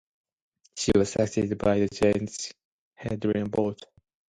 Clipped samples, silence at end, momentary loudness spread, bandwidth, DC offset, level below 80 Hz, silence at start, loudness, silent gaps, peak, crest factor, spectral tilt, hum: under 0.1%; 0.45 s; 14 LU; 11.5 kHz; under 0.1%; -50 dBFS; 0.75 s; -26 LUFS; 2.65-2.91 s; -8 dBFS; 20 dB; -5.5 dB/octave; none